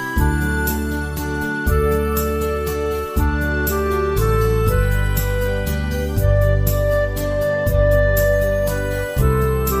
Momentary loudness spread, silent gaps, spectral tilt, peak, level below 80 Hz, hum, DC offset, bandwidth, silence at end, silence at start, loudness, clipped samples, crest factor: 6 LU; none; -6 dB/octave; -4 dBFS; -22 dBFS; none; under 0.1%; 16 kHz; 0 s; 0 s; -19 LUFS; under 0.1%; 14 dB